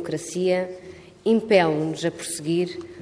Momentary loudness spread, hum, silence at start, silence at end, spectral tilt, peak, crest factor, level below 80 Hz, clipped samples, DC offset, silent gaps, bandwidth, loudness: 13 LU; none; 0 s; 0 s; -5 dB/octave; -4 dBFS; 20 dB; -64 dBFS; under 0.1%; under 0.1%; none; 11 kHz; -23 LUFS